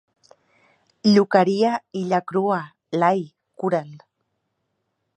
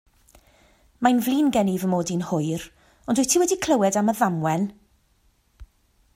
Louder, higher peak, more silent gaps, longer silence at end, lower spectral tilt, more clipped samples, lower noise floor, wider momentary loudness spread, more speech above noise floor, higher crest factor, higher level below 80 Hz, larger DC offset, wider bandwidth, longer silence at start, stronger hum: about the same, -21 LUFS vs -22 LUFS; about the same, -2 dBFS vs -4 dBFS; neither; first, 1.2 s vs 0.5 s; first, -6.5 dB/octave vs -5 dB/octave; neither; first, -75 dBFS vs -63 dBFS; first, 12 LU vs 9 LU; first, 55 dB vs 42 dB; about the same, 22 dB vs 20 dB; second, -72 dBFS vs -56 dBFS; neither; second, 8.8 kHz vs 16 kHz; about the same, 1.05 s vs 1 s; neither